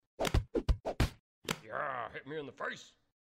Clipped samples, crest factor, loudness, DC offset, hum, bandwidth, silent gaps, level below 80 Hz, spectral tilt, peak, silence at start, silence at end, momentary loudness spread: under 0.1%; 18 dB; -38 LUFS; under 0.1%; none; 16 kHz; 1.20-1.42 s; -40 dBFS; -5 dB/octave; -18 dBFS; 0.2 s; 0.4 s; 10 LU